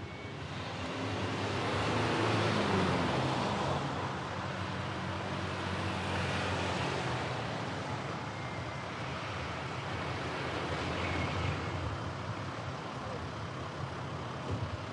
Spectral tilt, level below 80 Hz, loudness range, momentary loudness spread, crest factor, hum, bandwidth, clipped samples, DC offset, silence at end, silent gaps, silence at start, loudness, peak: -5.5 dB/octave; -58 dBFS; 6 LU; 9 LU; 18 dB; none; 11.5 kHz; under 0.1%; under 0.1%; 0 s; none; 0 s; -35 LUFS; -18 dBFS